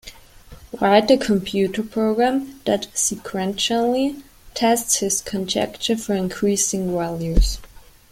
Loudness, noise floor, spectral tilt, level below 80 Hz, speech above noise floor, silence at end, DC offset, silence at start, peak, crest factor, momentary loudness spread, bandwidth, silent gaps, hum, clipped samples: -20 LUFS; -44 dBFS; -3.5 dB/octave; -30 dBFS; 24 dB; 0.45 s; under 0.1%; 0.05 s; -2 dBFS; 20 dB; 8 LU; 16.5 kHz; none; none; under 0.1%